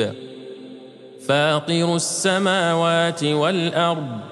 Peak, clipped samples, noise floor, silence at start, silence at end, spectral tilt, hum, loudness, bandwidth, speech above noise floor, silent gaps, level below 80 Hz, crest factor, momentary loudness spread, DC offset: -6 dBFS; under 0.1%; -41 dBFS; 0 s; 0 s; -4 dB/octave; none; -20 LUFS; 12.5 kHz; 21 dB; none; -72 dBFS; 16 dB; 19 LU; under 0.1%